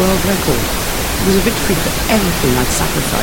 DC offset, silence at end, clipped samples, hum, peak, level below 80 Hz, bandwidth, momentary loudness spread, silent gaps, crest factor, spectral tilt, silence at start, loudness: under 0.1%; 0 s; under 0.1%; none; 0 dBFS; -24 dBFS; 17 kHz; 3 LU; none; 14 dB; -4 dB/octave; 0 s; -15 LUFS